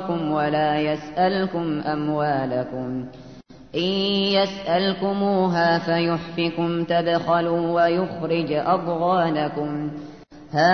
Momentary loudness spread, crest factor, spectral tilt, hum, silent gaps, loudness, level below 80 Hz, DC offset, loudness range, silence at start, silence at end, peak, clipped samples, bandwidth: 8 LU; 16 dB; -7 dB/octave; none; none; -22 LUFS; -58 dBFS; 0.2%; 3 LU; 0 s; 0 s; -6 dBFS; under 0.1%; 6.6 kHz